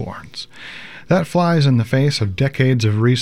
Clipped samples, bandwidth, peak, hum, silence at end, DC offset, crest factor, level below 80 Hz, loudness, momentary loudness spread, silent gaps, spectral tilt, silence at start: under 0.1%; 12 kHz; -4 dBFS; none; 0 s; 0.8%; 14 dB; -50 dBFS; -17 LUFS; 17 LU; none; -6.5 dB/octave; 0 s